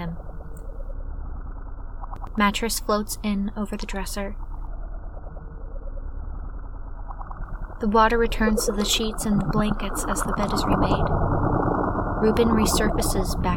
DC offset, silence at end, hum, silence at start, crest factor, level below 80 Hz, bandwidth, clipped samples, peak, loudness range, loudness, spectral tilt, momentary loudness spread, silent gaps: under 0.1%; 0 s; none; 0 s; 18 dB; -30 dBFS; 18.5 kHz; under 0.1%; -6 dBFS; 13 LU; -23 LUFS; -5 dB/octave; 19 LU; none